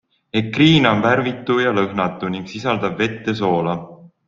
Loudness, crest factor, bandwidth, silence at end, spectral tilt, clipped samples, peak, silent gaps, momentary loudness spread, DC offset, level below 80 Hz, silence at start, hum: -18 LUFS; 18 dB; 7.4 kHz; 0.2 s; -6.5 dB/octave; under 0.1%; -2 dBFS; none; 11 LU; under 0.1%; -52 dBFS; 0.35 s; none